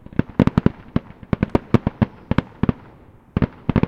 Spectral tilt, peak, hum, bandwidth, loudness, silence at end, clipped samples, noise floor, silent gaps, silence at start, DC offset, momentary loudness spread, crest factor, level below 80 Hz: -9.5 dB/octave; 0 dBFS; none; 7.4 kHz; -22 LUFS; 0 s; under 0.1%; -47 dBFS; none; 0.2 s; under 0.1%; 9 LU; 22 dB; -34 dBFS